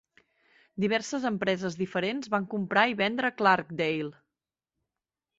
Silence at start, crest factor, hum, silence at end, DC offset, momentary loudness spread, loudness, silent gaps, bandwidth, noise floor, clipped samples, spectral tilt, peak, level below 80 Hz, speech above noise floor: 0.75 s; 22 dB; none; 1.25 s; under 0.1%; 7 LU; -28 LUFS; none; 8 kHz; -89 dBFS; under 0.1%; -5 dB/octave; -8 dBFS; -70 dBFS; 61 dB